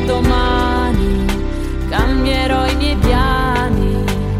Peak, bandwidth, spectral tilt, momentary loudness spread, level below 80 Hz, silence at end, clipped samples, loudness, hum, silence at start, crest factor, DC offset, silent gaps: -2 dBFS; 15.5 kHz; -6 dB/octave; 5 LU; -18 dBFS; 0 s; under 0.1%; -16 LUFS; none; 0 s; 12 dB; under 0.1%; none